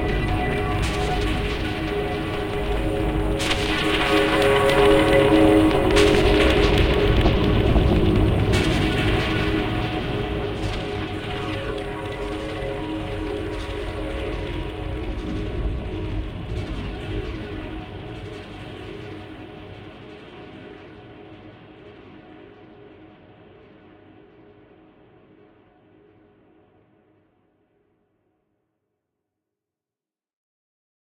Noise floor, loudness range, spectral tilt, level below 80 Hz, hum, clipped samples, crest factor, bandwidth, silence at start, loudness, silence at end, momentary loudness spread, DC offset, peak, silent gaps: under -90 dBFS; 22 LU; -6 dB/octave; -30 dBFS; none; under 0.1%; 20 dB; 16.5 kHz; 0 s; -22 LUFS; 7.95 s; 22 LU; under 0.1%; -4 dBFS; none